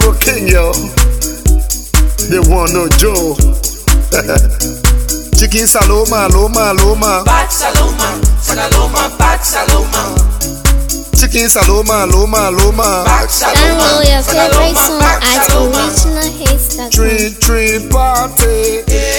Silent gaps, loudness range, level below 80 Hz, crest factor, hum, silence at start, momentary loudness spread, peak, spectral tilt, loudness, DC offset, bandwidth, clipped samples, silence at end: none; 3 LU; -12 dBFS; 10 dB; none; 0 s; 5 LU; 0 dBFS; -3.5 dB/octave; -10 LUFS; under 0.1%; 19.5 kHz; 0.2%; 0 s